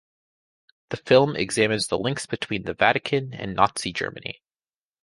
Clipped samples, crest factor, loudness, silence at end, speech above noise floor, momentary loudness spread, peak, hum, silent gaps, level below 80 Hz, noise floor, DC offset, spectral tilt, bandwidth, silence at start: under 0.1%; 22 dB; -23 LUFS; 0.7 s; over 67 dB; 17 LU; -2 dBFS; none; none; -56 dBFS; under -90 dBFS; under 0.1%; -4 dB/octave; 11.5 kHz; 0.9 s